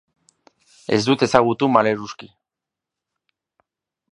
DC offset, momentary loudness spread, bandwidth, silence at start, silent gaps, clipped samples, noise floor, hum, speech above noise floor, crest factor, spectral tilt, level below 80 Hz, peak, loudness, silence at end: under 0.1%; 19 LU; 11 kHz; 0.9 s; none; under 0.1%; -86 dBFS; none; 68 dB; 22 dB; -5.5 dB/octave; -60 dBFS; 0 dBFS; -18 LUFS; 1.85 s